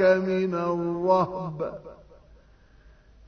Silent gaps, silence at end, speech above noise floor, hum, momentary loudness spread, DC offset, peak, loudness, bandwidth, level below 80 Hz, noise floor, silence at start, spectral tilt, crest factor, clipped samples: none; 1.35 s; 30 dB; none; 14 LU; under 0.1%; -8 dBFS; -26 LUFS; 6.6 kHz; -56 dBFS; -55 dBFS; 0 s; -8 dB/octave; 20 dB; under 0.1%